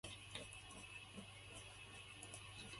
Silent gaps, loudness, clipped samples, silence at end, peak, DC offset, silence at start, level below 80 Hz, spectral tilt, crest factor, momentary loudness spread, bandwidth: none; -54 LUFS; under 0.1%; 0 s; -32 dBFS; under 0.1%; 0.05 s; -70 dBFS; -2.5 dB/octave; 24 dB; 3 LU; 11.5 kHz